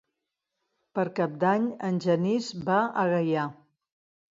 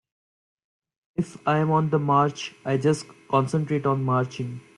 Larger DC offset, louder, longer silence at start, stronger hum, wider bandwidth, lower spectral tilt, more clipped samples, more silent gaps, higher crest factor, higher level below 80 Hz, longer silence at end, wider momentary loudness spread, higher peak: neither; second, -27 LUFS vs -24 LUFS; second, 0.95 s vs 1.2 s; neither; second, 7.8 kHz vs 11 kHz; about the same, -7 dB/octave vs -7 dB/octave; neither; neither; about the same, 18 dB vs 18 dB; second, -72 dBFS vs -64 dBFS; first, 0.8 s vs 0.15 s; second, 5 LU vs 10 LU; second, -12 dBFS vs -8 dBFS